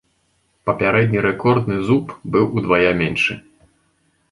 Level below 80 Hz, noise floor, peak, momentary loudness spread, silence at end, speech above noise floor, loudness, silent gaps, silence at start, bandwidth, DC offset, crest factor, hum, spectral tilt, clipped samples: -48 dBFS; -64 dBFS; -2 dBFS; 6 LU; 0.9 s; 47 dB; -18 LUFS; none; 0.65 s; 11.5 kHz; under 0.1%; 16 dB; none; -7 dB/octave; under 0.1%